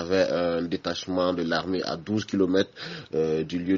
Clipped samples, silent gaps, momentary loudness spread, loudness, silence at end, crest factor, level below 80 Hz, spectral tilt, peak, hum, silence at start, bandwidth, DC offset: under 0.1%; none; 6 LU; -27 LUFS; 0 s; 16 dB; -58 dBFS; -4.5 dB/octave; -10 dBFS; none; 0 s; 7.4 kHz; under 0.1%